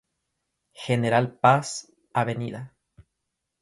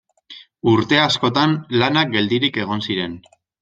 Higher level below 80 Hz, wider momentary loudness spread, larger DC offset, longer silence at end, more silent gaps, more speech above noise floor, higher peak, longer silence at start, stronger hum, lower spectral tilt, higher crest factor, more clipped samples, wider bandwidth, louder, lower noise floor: second, -64 dBFS vs -56 dBFS; first, 18 LU vs 8 LU; neither; first, 0.95 s vs 0.45 s; neither; first, 58 dB vs 26 dB; about the same, -4 dBFS vs -2 dBFS; first, 0.8 s vs 0.3 s; neither; about the same, -5.5 dB/octave vs -5.5 dB/octave; first, 24 dB vs 18 dB; neither; first, 11.5 kHz vs 8.8 kHz; second, -24 LUFS vs -18 LUFS; first, -81 dBFS vs -44 dBFS